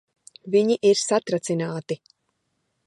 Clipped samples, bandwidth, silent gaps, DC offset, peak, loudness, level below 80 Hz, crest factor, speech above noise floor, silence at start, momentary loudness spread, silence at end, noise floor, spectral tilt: under 0.1%; 11.5 kHz; none; under 0.1%; -8 dBFS; -22 LUFS; -76 dBFS; 18 dB; 52 dB; 0.45 s; 14 LU; 0.9 s; -74 dBFS; -4.5 dB/octave